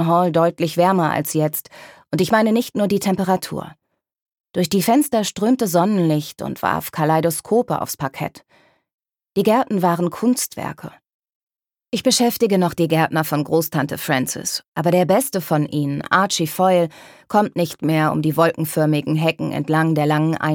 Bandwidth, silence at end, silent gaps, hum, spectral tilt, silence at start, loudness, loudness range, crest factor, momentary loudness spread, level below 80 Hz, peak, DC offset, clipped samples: 19 kHz; 0 s; 4.22-4.26 s, 8.94-8.99 s, 11.14-11.23 s, 11.35-11.47 s, 14.68-14.72 s; none; -5 dB/octave; 0 s; -19 LUFS; 3 LU; 18 dB; 9 LU; -60 dBFS; -2 dBFS; under 0.1%; under 0.1%